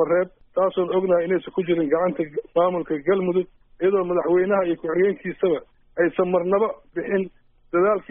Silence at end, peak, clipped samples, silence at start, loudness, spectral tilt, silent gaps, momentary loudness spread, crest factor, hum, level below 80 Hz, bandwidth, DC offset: 0.1 s; -6 dBFS; under 0.1%; 0 s; -22 LUFS; -3.5 dB/octave; none; 6 LU; 14 dB; none; -58 dBFS; 3.7 kHz; under 0.1%